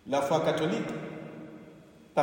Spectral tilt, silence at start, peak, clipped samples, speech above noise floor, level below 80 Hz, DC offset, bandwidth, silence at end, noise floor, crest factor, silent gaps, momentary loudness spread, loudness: -5.5 dB/octave; 0.05 s; -12 dBFS; under 0.1%; 24 dB; -70 dBFS; under 0.1%; 16 kHz; 0 s; -53 dBFS; 20 dB; none; 20 LU; -30 LUFS